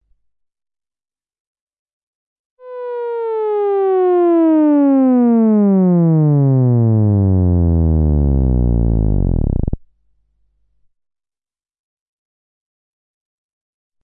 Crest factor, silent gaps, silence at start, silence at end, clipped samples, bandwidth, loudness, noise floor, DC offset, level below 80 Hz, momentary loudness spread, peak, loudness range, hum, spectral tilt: 12 dB; none; 2.65 s; 4.25 s; under 0.1%; 3.5 kHz; -14 LUFS; under -90 dBFS; under 0.1%; -26 dBFS; 10 LU; -4 dBFS; 14 LU; none; -15 dB/octave